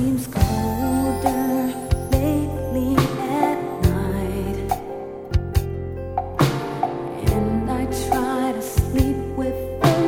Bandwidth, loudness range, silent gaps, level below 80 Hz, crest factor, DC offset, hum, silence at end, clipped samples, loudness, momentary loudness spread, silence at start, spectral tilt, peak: 18 kHz; 3 LU; none; -30 dBFS; 20 dB; under 0.1%; none; 0 s; under 0.1%; -22 LUFS; 5 LU; 0 s; -6.5 dB/octave; -2 dBFS